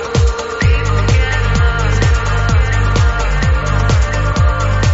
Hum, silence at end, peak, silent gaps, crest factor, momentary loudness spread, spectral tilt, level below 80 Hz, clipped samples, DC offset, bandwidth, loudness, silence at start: none; 0 s; -2 dBFS; none; 10 dB; 2 LU; -5.5 dB/octave; -16 dBFS; under 0.1%; under 0.1%; 8 kHz; -14 LUFS; 0 s